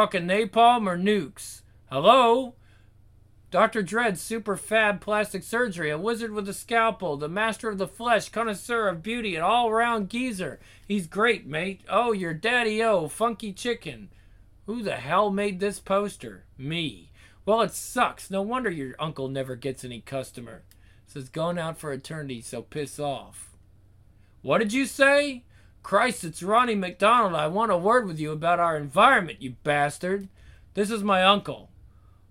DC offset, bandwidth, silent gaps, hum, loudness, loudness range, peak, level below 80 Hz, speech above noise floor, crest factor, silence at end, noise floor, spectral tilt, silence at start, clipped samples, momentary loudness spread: under 0.1%; 16.5 kHz; none; none; -25 LUFS; 10 LU; -4 dBFS; -56 dBFS; 31 dB; 22 dB; 0.65 s; -56 dBFS; -4.5 dB/octave; 0 s; under 0.1%; 16 LU